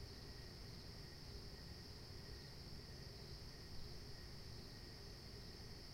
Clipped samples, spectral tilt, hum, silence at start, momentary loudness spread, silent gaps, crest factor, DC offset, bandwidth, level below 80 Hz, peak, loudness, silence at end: under 0.1%; -4.5 dB/octave; none; 0 s; 1 LU; none; 16 dB; under 0.1%; 16.5 kHz; -60 dBFS; -38 dBFS; -55 LUFS; 0 s